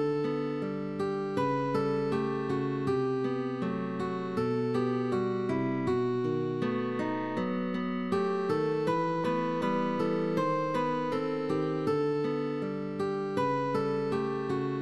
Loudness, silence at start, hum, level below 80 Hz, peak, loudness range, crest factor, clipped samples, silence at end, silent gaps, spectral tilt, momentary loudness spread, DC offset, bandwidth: -31 LUFS; 0 s; none; -68 dBFS; -16 dBFS; 1 LU; 14 dB; under 0.1%; 0 s; none; -8 dB/octave; 4 LU; 0.1%; 11.5 kHz